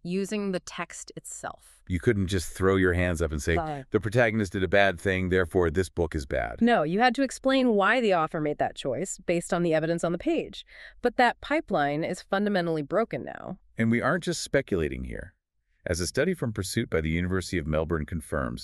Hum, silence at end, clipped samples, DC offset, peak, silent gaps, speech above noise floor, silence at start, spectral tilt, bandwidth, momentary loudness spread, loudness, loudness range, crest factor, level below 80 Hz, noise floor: none; 0 s; under 0.1%; under 0.1%; -4 dBFS; none; 41 dB; 0.05 s; -5.5 dB/octave; 13.5 kHz; 13 LU; -27 LUFS; 5 LU; 22 dB; -44 dBFS; -68 dBFS